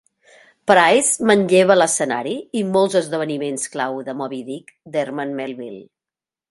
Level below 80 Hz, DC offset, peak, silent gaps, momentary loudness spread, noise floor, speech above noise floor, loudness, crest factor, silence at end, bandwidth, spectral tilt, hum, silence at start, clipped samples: -66 dBFS; under 0.1%; 0 dBFS; none; 15 LU; -90 dBFS; 71 dB; -18 LUFS; 18 dB; 0.7 s; 12 kHz; -3.5 dB/octave; none; 0.65 s; under 0.1%